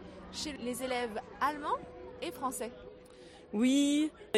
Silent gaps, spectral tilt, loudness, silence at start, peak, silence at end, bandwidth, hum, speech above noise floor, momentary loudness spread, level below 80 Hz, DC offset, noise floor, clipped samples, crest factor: none; -3.5 dB/octave; -34 LUFS; 0 s; -16 dBFS; 0 s; 15 kHz; none; 21 dB; 23 LU; -62 dBFS; under 0.1%; -54 dBFS; under 0.1%; 18 dB